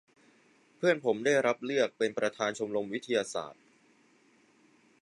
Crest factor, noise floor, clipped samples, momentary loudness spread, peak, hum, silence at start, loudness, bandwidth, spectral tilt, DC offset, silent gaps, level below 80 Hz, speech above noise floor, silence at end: 20 dB; -65 dBFS; under 0.1%; 8 LU; -12 dBFS; none; 0.8 s; -31 LUFS; 11.5 kHz; -4 dB/octave; under 0.1%; none; -80 dBFS; 35 dB; 1.5 s